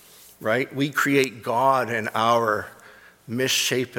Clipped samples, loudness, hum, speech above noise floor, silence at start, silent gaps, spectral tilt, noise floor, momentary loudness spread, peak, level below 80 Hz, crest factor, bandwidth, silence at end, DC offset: under 0.1%; -22 LUFS; none; 27 dB; 0.4 s; none; -3.5 dB/octave; -50 dBFS; 8 LU; -6 dBFS; -68 dBFS; 18 dB; 19 kHz; 0 s; under 0.1%